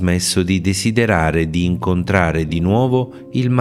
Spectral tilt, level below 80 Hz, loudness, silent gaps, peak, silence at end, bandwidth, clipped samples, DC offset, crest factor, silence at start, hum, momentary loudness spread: -5.5 dB/octave; -38 dBFS; -17 LUFS; none; 0 dBFS; 0 s; 15 kHz; under 0.1%; 0.1%; 16 dB; 0 s; none; 4 LU